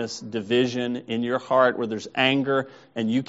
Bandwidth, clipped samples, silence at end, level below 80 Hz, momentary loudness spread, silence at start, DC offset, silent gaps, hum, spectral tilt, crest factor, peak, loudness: 8 kHz; under 0.1%; 0.05 s; -68 dBFS; 9 LU; 0 s; under 0.1%; none; none; -3.5 dB/octave; 20 dB; -4 dBFS; -24 LUFS